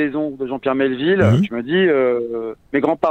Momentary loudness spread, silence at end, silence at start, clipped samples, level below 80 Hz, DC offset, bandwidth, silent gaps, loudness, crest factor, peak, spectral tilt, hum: 9 LU; 0 s; 0 s; under 0.1%; -52 dBFS; under 0.1%; 8.6 kHz; none; -18 LUFS; 16 dB; -2 dBFS; -8 dB/octave; none